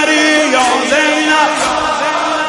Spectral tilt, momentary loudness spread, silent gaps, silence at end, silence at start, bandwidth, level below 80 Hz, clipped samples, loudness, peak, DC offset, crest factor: -1.5 dB/octave; 5 LU; none; 0 s; 0 s; 11.5 kHz; -48 dBFS; under 0.1%; -11 LUFS; 0 dBFS; under 0.1%; 12 dB